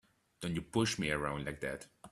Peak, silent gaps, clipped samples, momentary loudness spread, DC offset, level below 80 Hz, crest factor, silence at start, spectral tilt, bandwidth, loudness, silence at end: -18 dBFS; none; under 0.1%; 10 LU; under 0.1%; -58 dBFS; 20 dB; 0.4 s; -4.5 dB/octave; 14 kHz; -37 LUFS; 0.05 s